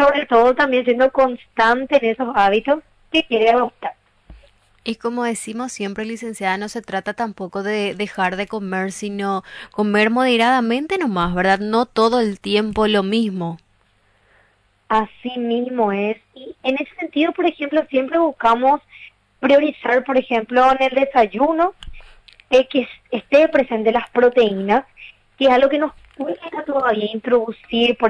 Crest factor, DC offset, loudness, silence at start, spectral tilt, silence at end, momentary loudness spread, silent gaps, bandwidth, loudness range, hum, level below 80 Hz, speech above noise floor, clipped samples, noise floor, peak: 16 dB; under 0.1%; -18 LUFS; 0 s; -5 dB/octave; 0 s; 11 LU; none; 11 kHz; 7 LU; none; -48 dBFS; 41 dB; under 0.1%; -59 dBFS; -4 dBFS